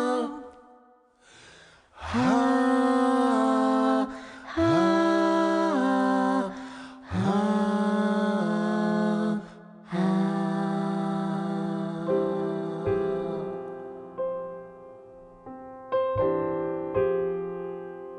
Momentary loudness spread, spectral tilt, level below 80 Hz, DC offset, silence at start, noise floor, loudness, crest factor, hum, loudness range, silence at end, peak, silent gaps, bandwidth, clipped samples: 17 LU; -7 dB/octave; -60 dBFS; under 0.1%; 0 s; -59 dBFS; -26 LUFS; 14 dB; none; 8 LU; 0 s; -12 dBFS; none; 10 kHz; under 0.1%